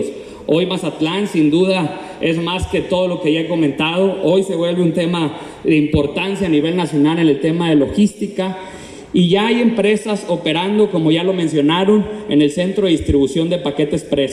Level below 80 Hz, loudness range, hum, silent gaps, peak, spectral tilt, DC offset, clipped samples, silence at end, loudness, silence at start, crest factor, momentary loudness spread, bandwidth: -40 dBFS; 2 LU; none; none; -2 dBFS; -6.5 dB/octave; under 0.1%; under 0.1%; 0 s; -16 LUFS; 0 s; 14 dB; 6 LU; 12 kHz